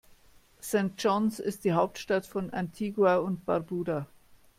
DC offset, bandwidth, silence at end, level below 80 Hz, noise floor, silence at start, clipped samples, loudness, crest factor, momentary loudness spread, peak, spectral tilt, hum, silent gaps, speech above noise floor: under 0.1%; 16.5 kHz; 0.55 s; -64 dBFS; -59 dBFS; 0.65 s; under 0.1%; -29 LUFS; 18 dB; 10 LU; -12 dBFS; -6 dB/octave; none; none; 30 dB